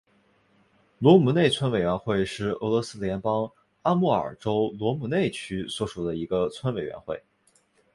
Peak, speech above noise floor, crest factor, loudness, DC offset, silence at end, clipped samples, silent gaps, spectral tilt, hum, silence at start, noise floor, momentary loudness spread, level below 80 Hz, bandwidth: -4 dBFS; 41 dB; 22 dB; -25 LUFS; under 0.1%; 0.75 s; under 0.1%; none; -6.5 dB/octave; none; 1 s; -65 dBFS; 13 LU; -54 dBFS; 11.5 kHz